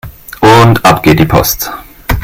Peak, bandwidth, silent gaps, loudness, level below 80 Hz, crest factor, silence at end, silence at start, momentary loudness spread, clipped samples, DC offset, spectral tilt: 0 dBFS; 17.5 kHz; none; -7 LUFS; -24 dBFS; 8 dB; 0 s; 0.05 s; 15 LU; 3%; under 0.1%; -5 dB/octave